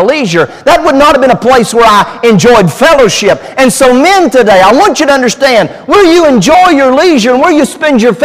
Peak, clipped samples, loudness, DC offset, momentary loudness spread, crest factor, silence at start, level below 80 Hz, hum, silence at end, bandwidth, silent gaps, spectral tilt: 0 dBFS; 3%; -5 LUFS; under 0.1%; 4 LU; 6 dB; 0 s; -34 dBFS; none; 0 s; 16 kHz; none; -4.5 dB/octave